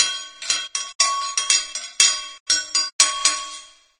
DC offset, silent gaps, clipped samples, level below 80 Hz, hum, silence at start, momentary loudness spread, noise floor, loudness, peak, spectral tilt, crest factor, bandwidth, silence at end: under 0.1%; 0.95-0.99 s, 2.40-2.46 s, 2.93-2.99 s; under 0.1%; -64 dBFS; none; 0 s; 12 LU; -41 dBFS; -19 LUFS; 0 dBFS; 4 dB/octave; 22 dB; 16 kHz; 0.35 s